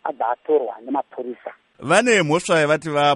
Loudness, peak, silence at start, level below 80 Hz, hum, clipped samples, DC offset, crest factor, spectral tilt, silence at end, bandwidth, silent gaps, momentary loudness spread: -19 LUFS; -2 dBFS; 0.05 s; -64 dBFS; none; under 0.1%; under 0.1%; 18 dB; -4 dB/octave; 0 s; 11.5 kHz; none; 17 LU